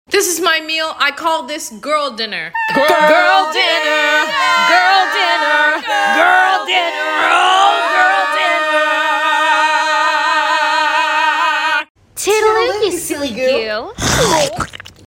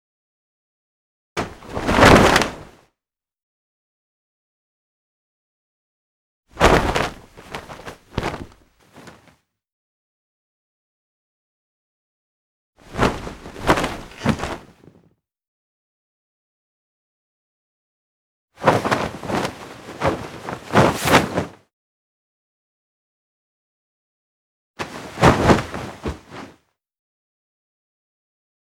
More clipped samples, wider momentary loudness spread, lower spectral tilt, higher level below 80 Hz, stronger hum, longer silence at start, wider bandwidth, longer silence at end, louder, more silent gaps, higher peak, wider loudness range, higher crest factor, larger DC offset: neither; second, 9 LU vs 21 LU; second, -2 dB/octave vs -5 dB/octave; second, -44 dBFS vs -38 dBFS; neither; second, 0.1 s vs 1.35 s; second, 17 kHz vs 19.5 kHz; second, 0.3 s vs 2.15 s; first, -13 LUFS vs -19 LUFS; second, 11.90-11.95 s vs 3.43-6.43 s, 9.72-12.73 s, 15.48-18.48 s, 21.73-24.74 s; about the same, 0 dBFS vs 0 dBFS; second, 3 LU vs 16 LU; second, 14 dB vs 24 dB; neither